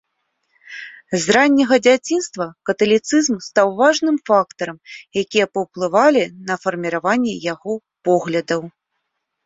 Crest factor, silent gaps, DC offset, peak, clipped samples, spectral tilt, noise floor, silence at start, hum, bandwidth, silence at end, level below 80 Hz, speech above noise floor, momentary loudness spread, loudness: 18 dB; none; under 0.1%; 0 dBFS; under 0.1%; -4 dB/octave; -75 dBFS; 0.7 s; none; 8 kHz; 0.75 s; -62 dBFS; 57 dB; 14 LU; -18 LUFS